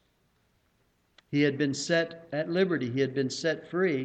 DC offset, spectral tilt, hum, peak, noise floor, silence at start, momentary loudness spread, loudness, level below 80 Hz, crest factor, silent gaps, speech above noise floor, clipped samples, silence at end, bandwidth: under 0.1%; -5 dB/octave; none; -12 dBFS; -70 dBFS; 1.3 s; 5 LU; -29 LUFS; -72 dBFS; 18 dB; none; 42 dB; under 0.1%; 0 s; 9 kHz